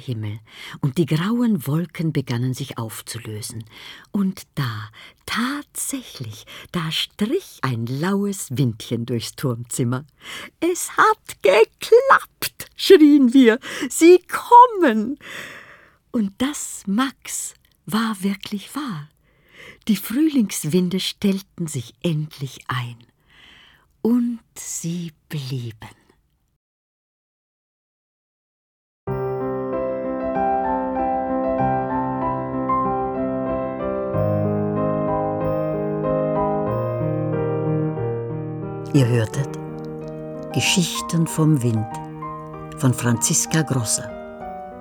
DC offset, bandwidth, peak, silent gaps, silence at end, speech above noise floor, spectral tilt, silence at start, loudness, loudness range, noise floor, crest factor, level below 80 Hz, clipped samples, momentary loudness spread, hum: under 0.1%; over 20 kHz; -2 dBFS; 26.56-29.07 s; 0 s; 41 dB; -5 dB/octave; 0 s; -21 LUFS; 12 LU; -61 dBFS; 20 dB; -50 dBFS; under 0.1%; 16 LU; none